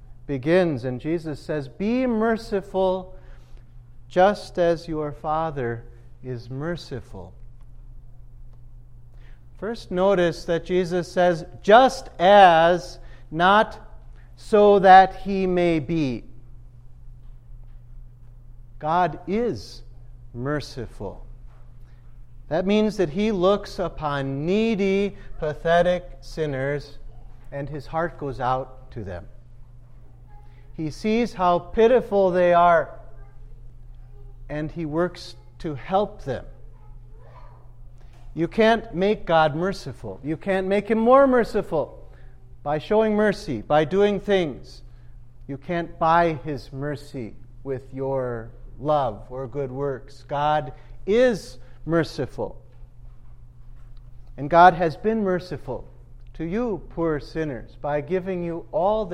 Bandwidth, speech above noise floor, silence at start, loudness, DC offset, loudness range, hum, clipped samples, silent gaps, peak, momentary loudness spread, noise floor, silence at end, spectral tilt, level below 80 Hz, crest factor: 12 kHz; 22 dB; 0 s; -22 LUFS; under 0.1%; 13 LU; none; under 0.1%; none; -2 dBFS; 19 LU; -44 dBFS; 0 s; -6.5 dB/octave; -42 dBFS; 22 dB